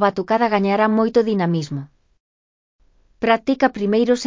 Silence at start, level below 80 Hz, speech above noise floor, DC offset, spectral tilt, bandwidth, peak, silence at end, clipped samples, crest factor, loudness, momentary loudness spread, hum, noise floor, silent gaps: 0 s; -58 dBFS; over 72 dB; under 0.1%; -6.5 dB/octave; 7.6 kHz; -4 dBFS; 0 s; under 0.1%; 16 dB; -19 LUFS; 7 LU; none; under -90 dBFS; 2.20-2.79 s